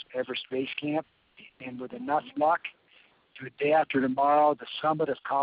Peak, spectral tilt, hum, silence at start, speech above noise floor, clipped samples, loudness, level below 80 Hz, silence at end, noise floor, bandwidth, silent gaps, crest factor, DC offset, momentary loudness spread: -12 dBFS; -3 dB/octave; none; 0 s; 34 dB; under 0.1%; -28 LUFS; -74 dBFS; 0 s; -62 dBFS; 5 kHz; none; 16 dB; under 0.1%; 17 LU